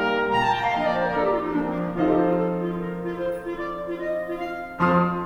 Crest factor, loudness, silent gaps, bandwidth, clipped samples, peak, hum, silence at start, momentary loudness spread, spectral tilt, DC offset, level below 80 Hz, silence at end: 16 dB; -24 LUFS; none; 11 kHz; under 0.1%; -8 dBFS; none; 0 s; 9 LU; -7.5 dB/octave; under 0.1%; -48 dBFS; 0 s